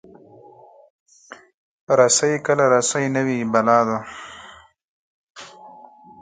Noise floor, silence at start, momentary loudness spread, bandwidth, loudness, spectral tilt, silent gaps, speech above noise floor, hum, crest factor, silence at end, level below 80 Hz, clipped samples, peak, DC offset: -47 dBFS; 1.3 s; 25 LU; 9.6 kHz; -18 LUFS; -3.5 dB/octave; 1.54-1.87 s, 4.84-5.35 s; 29 dB; none; 20 dB; 0.5 s; -64 dBFS; under 0.1%; -2 dBFS; under 0.1%